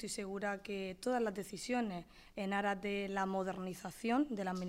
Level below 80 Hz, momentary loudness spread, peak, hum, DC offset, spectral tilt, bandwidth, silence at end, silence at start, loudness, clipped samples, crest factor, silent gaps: -66 dBFS; 8 LU; -24 dBFS; none; under 0.1%; -5 dB/octave; 16 kHz; 0 s; 0 s; -39 LUFS; under 0.1%; 16 dB; none